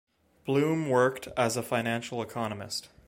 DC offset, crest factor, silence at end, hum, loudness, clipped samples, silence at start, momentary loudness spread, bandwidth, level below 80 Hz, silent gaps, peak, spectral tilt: under 0.1%; 20 dB; 0.2 s; none; -29 LUFS; under 0.1%; 0.45 s; 10 LU; 16.5 kHz; -64 dBFS; none; -10 dBFS; -5 dB/octave